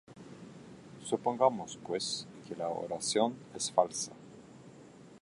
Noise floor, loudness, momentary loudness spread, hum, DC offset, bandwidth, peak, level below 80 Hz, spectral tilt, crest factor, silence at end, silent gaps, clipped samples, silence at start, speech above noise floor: -54 dBFS; -33 LUFS; 24 LU; none; under 0.1%; 11.5 kHz; -10 dBFS; -74 dBFS; -3.5 dB/octave; 26 dB; 0.05 s; none; under 0.1%; 0.1 s; 21 dB